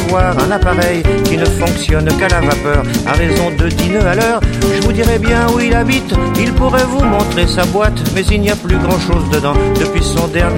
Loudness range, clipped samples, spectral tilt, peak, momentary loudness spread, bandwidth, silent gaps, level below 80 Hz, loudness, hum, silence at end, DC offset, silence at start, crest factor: 1 LU; under 0.1%; -5.5 dB/octave; 0 dBFS; 2 LU; 16.5 kHz; none; -18 dBFS; -13 LUFS; none; 0 s; under 0.1%; 0 s; 12 dB